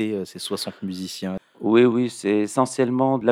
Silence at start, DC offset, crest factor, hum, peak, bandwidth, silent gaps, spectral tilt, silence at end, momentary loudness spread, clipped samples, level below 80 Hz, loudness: 0 s; under 0.1%; 18 dB; none; -4 dBFS; 15.5 kHz; none; -5.5 dB/octave; 0 s; 13 LU; under 0.1%; -68 dBFS; -22 LUFS